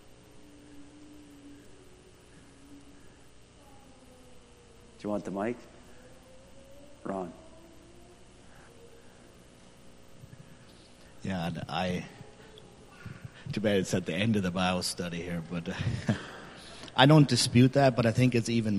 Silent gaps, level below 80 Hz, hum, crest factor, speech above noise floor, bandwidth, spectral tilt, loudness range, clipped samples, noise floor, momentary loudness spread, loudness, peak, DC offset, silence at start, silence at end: none; -60 dBFS; 60 Hz at -65 dBFS; 28 dB; 28 dB; 13 kHz; -5.5 dB/octave; 20 LU; under 0.1%; -55 dBFS; 28 LU; -28 LUFS; -4 dBFS; under 0.1%; 0.1 s; 0 s